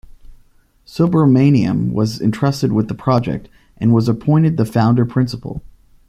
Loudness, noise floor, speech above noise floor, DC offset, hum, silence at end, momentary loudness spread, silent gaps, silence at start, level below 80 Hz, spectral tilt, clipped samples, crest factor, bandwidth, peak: -16 LUFS; -51 dBFS; 37 dB; under 0.1%; none; 0.5 s; 13 LU; none; 0.3 s; -44 dBFS; -8 dB/octave; under 0.1%; 14 dB; 14.5 kHz; -2 dBFS